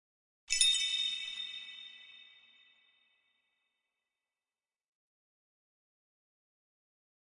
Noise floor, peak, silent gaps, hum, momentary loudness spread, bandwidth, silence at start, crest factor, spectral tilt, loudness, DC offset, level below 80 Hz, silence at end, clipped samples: under -90 dBFS; -12 dBFS; none; none; 24 LU; 11.5 kHz; 0.5 s; 30 dB; 5 dB/octave; -30 LUFS; under 0.1%; -70 dBFS; 5 s; under 0.1%